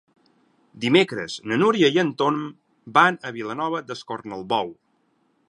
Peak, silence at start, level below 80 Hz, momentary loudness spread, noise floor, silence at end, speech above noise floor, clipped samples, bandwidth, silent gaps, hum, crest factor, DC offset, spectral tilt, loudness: -2 dBFS; 0.75 s; -70 dBFS; 15 LU; -66 dBFS; 0.75 s; 45 dB; under 0.1%; 11 kHz; none; none; 22 dB; under 0.1%; -5 dB/octave; -22 LUFS